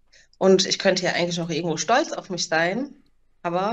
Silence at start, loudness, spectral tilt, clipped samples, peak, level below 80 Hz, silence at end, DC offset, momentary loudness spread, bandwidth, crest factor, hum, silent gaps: 0.4 s; -22 LUFS; -3.5 dB/octave; under 0.1%; -6 dBFS; -62 dBFS; 0 s; under 0.1%; 11 LU; 8.6 kHz; 16 dB; none; none